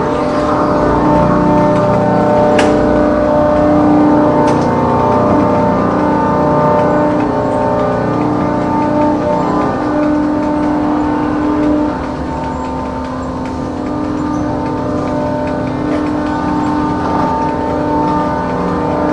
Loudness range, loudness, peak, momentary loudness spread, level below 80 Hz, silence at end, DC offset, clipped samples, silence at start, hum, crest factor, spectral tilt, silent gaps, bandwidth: 6 LU; -13 LUFS; 0 dBFS; 8 LU; -32 dBFS; 0 s; under 0.1%; under 0.1%; 0 s; none; 12 dB; -8 dB/octave; none; 10.5 kHz